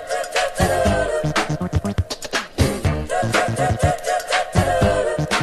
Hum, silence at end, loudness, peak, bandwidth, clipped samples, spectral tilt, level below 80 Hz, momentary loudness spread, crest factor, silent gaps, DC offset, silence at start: none; 0 s; -20 LUFS; -4 dBFS; 14 kHz; under 0.1%; -5 dB/octave; -34 dBFS; 5 LU; 16 dB; none; under 0.1%; 0 s